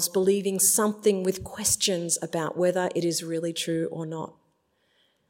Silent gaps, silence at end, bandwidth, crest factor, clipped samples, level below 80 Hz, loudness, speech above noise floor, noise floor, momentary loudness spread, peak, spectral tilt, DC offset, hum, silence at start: none; 1 s; 16.5 kHz; 18 dB; under 0.1%; -60 dBFS; -25 LUFS; 44 dB; -70 dBFS; 11 LU; -8 dBFS; -3 dB/octave; under 0.1%; none; 0 s